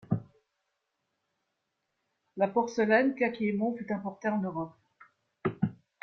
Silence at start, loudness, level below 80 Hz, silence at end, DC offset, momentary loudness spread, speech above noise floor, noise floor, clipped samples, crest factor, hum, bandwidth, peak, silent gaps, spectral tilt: 0.1 s; -30 LUFS; -68 dBFS; 0.3 s; under 0.1%; 11 LU; 53 dB; -82 dBFS; under 0.1%; 22 dB; none; 6.6 kHz; -10 dBFS; none; -7.5 dB/octave